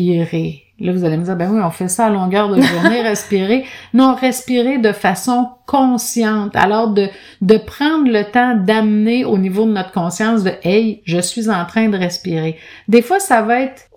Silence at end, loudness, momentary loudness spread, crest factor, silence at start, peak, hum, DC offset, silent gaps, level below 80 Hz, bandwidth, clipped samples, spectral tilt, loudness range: 0.25 s; -15 LUFS; 6 LU; 14 dB; 0 s; 0 dBFS; none; under 0.1%; none; -54 dBFS; 17.5 kHz; 0.1%; -5.5 dB/octave; 2 LU